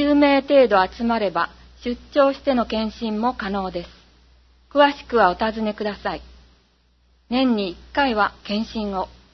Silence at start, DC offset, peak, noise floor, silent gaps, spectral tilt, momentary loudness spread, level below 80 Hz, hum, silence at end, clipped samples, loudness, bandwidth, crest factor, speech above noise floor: 0 s; under 0.1%; -2 dBFS; -60 dBFS; none; -6.5 dB/octave; 13 LU; -46 dBFS; none; 0.25 s; under 0.1%; -21 LUFS; 6.2 kHz; 20 dB; 40 dB